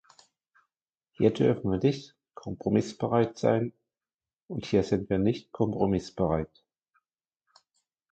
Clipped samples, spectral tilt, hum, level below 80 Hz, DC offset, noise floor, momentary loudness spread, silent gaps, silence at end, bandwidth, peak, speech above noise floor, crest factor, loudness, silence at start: under 0.1%; -7.5 dB/octave; none; -54 dBFS; under 0.1%; under -90 dBFS; 13 LU; 4.36-4.48 s; 1.65 s; 8.8 kHz; -10 dBFS; over 63 dB; 20 dB; -28 LUFS; 1.2 s